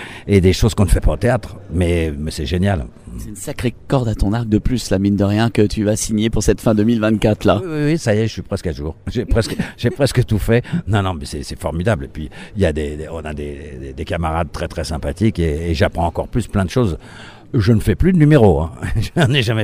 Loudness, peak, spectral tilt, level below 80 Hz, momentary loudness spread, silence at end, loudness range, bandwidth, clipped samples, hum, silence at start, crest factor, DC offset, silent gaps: -18 LUFS; 0 dBFS; -6.5 dB/octave; -28 dBFS; 12 LU; 0 s; 6 LU; 16 kHz; under 0.1%; none; 0 s; 16 dB; under 0.1%; none